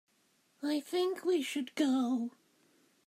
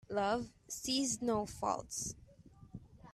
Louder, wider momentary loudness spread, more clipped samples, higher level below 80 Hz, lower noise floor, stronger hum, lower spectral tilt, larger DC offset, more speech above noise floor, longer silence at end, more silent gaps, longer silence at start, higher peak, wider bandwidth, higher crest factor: first, -34 LUFS vs -37 LUFS; second, 7 LU vs 20 LU; neither; second, under -90 dBFS vs -62 dBFS; first, -73 dBFS vs -60 dBFS; neither; about the same, -3.5 dB/octave vs -3 dB/octave; neither; first, 40 dB vs 23 dB; first, 0.8 s vs 0 s; neither; first, 0.6 s vs 0.1 s; about the same, -20 dBFS vs -22 dBFS; first, 15.5 kHz vs 14 kHz; about the same, 16 dB vs 18 dB